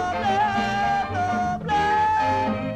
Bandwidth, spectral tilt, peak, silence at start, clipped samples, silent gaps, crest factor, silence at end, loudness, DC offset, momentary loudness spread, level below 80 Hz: 10 kHz; -5.5 dB/octave; -12 dBFS; 0 s; under 0.1%; none; 12 dB; 0 s; -22 LUFS; under 0.1%; 4 LU; -46 dBFS